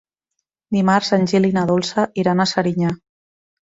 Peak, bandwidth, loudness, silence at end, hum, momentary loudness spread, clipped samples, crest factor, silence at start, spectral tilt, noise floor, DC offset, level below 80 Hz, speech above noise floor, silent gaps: -2 dBFS; 7.8 kHz; -18 LUFS; 0.65 s; none; 7 LU; under 0.1%; 18 dB; 0.7 s; -6 dB/octave; -78 dBFS; under 0.1%; -56 dBFS; 61 dB; none